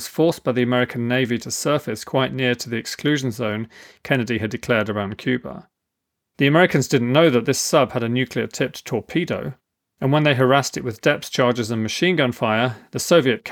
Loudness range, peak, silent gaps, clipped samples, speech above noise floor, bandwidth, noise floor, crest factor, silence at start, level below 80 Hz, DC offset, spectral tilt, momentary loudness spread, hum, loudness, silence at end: 4 LU; -2 dBFS; none; under 0.1%; 60 dB; 19 kHz; -80 dBFS; 18 dB; 0 s; -60 dBFS; under 0.1%; -5 dB/octave; 10 LU; none; -20 LUFS; 0 s